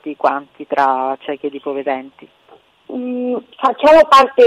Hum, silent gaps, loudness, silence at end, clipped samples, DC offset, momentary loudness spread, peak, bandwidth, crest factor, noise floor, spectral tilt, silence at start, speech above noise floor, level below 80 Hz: none; none; -15 LUFS; 0 s; under 0.1%; under 0.1%; 16 LU; -2 dBFS; 14.5 kHz; 14 dB; -44 dBFS; -3.5 dB/octave; 0.05 s; 30 dB; -50 dBFS